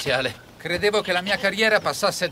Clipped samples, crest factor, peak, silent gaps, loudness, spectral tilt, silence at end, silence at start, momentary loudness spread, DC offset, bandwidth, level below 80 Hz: under 0.1%; 18 dB; -6 dBFS; none; -22 LUFS; -3 dB/octave; 0 s; 0 s; 9 LU; under 0.1%; 16 kHz; -54 dBFS